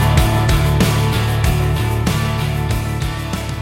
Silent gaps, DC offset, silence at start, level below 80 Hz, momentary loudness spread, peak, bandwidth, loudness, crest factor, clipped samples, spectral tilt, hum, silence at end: none; under 0.1%; 0 s; -22 dBFS; 7 LU; -2 dBFS; 16.5 kHz; -17 LUFS; 14 dB; under 0.1%; -5.5 dB/octave; none; 0 s